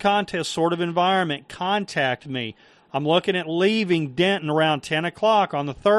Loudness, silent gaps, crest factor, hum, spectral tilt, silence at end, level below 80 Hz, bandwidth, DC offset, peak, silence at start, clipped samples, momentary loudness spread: -22 LUFS; none; 18 dB; none; -5 dB/octave; 0 s; -60 dBFS; 12 kHz; under 0.1%; -4 dBFS; 0 s; under 0.1%; 8 LU